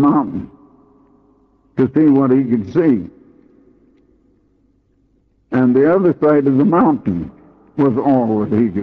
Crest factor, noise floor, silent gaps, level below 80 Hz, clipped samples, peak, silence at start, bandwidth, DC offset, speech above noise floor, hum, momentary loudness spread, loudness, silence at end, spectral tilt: 14 dB; -58 dBFS; none; -52 dBFS; under 0.1%; -4 dBFS; 0 s; 4.5 kHz; under 0.1%; 44 dB; none; 14 LU; -15 LUFS; 0 s; -11 dB/octave